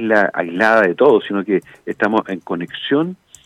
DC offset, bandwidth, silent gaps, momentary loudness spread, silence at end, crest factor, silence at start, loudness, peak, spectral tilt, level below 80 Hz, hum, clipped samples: under 0.1%; 11 kHz; none; 12 LU; 0.3 s; 14 dB; 0 s; -17 LUFS; -2 dBFS; -6 dB/octave; -64 dBFS; none; under 0.1%